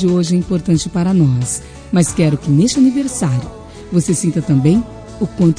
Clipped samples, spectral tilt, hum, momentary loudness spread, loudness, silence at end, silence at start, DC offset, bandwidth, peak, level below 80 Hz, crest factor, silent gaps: under 0.1%; -6.5 dB/octave; none; 10 LU; -15 LUFS; 0 s; 0 s; under 0.1%; 10.5 kHz; 0 dBFS; -38 dBFS; 14 dB; none